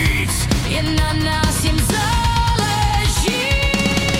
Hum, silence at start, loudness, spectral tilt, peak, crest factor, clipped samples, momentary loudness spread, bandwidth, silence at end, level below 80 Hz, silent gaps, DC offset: none; 0 s; -17 LUFS; -4 dB/octave; -4 dBFS; 14 dB; under 0.1%; 2 LU; 17 kHz; 0 s; -22 dBFS; none; under 0.1%